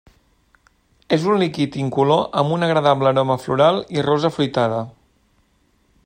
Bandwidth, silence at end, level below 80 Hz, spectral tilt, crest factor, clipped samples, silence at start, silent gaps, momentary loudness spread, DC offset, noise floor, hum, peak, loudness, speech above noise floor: 16 kHz; 1.15 s; -58 dBFS; -6.5 dB/octave; 18 dB; under 0.1%; 1.1 s; none; 6 LU; under 0.1%; -61 dBFS; none; -2 dBFS; -18 LUFS; 43 dB